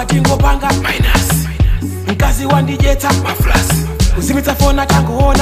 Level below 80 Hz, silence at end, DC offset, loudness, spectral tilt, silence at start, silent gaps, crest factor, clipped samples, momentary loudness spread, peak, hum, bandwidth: -16 dBFS; 0 s; under 0.1%; -13 LUFS; -5 dB/octave; 0 s; none; 12 dB; under 0.1%; 4 LU; 0 dBFS; none; 16 kHz